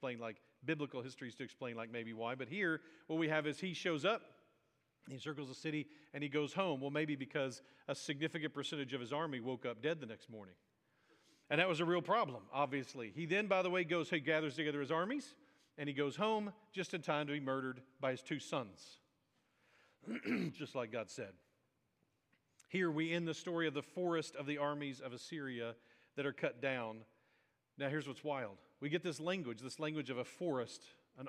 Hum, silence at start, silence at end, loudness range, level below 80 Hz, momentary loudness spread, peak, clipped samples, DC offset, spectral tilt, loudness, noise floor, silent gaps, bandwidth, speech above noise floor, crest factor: none; 0 s; 0 s; 6 LU; under -90 dBFS; 12 LU; -18 dBFS; under 0.1%; under 0.1%; -5.5 dB/octave; -41 LUFS; -81 dBFS; none; 12.5 kHz; 41 dB; 24 dB